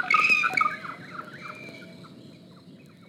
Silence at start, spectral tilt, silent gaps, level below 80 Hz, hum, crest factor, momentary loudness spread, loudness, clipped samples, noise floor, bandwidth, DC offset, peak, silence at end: 0 s; -2.5 dB/octave; none; -78 dBFS; none; 20 dB; 25 LU; -22 LUFS; under 0.1%; -50 dBFS; 16 kHz; under 0.1%; -8 dBFS; 0.3 s